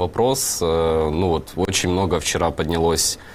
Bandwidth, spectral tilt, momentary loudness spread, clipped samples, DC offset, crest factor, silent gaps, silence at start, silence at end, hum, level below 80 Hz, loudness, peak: 16 kHz; -4 dB/octave; 3 LU; under 0.1%; 0.2%; 16 dB; none; 0 s; 0 s; none; -36 dBFS; -20 LUFS; -4 dBFS